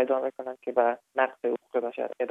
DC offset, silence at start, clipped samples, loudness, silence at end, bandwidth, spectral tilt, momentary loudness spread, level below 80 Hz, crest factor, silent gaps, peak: under 0.1%; 0 s; under 0.1%; -29 LUFS; 0 s; 3.9 kHz; -6 dB/octave; 7 LU; -88 dBFS; 18 dB; none; -10 dBFS